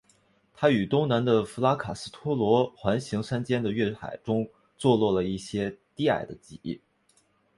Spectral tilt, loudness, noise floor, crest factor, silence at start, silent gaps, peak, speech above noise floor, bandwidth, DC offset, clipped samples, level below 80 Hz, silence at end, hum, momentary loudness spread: -6.5 dB/octave; -27 LUFS; -67 dBFS; 20 dB; 0.6 s; none; -8 dBFS; 41 dB; 11.5 kHz; under 0.1%; under 0.1%; -58 dBFS; 0.8 s; none; 14 LU